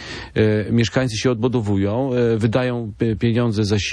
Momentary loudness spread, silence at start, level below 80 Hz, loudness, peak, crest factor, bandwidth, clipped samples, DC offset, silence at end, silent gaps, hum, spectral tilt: 4 LU; 0 s; -44 dBFS; -20 LUFS; -4 dBFS; 14 dB; 10.5 kHz; under 0.1%; under 0.1%; 0 s; none; none; -6.5 dB/octave